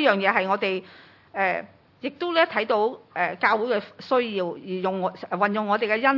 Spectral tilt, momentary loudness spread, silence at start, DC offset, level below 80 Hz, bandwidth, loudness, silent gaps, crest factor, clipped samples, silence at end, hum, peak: -6.5 dB/octave; 9 LU; 0 s; under 0.1%; -78 dBFS; 6 kHz; -24 LUFS; none; 20 dB; under 0.1%; 0 s; none; -4 dBFS